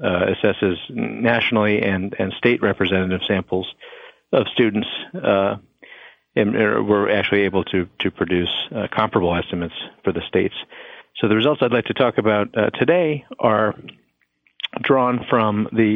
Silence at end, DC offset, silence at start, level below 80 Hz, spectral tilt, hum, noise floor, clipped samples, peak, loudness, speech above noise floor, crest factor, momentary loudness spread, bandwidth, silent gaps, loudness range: 0 s; under 0.1%; 0 s; -54 dBFS; -8.5 dB/octave; none; -64 dBFS; under 0.1%; -2 dBFS; -20 LUFS; 45 dB; 18 dB; 9 LU; 5.4 kHz; none; 3 LU